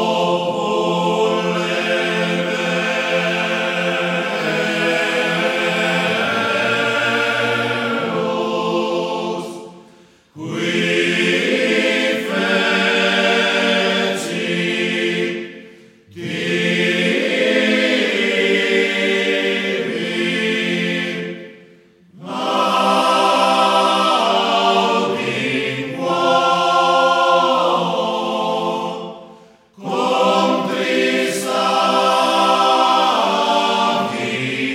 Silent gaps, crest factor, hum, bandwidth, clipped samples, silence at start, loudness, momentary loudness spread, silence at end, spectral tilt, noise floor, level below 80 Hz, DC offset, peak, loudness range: none; 16 dB; none; 16 kHz; under 0.1%; 0 s; -17 LUFS; 7 LU; 0 s; -4 dB/octave; -48 dBFS; -70 dBFS; under 0.1%; -2 dBFS; 4 LU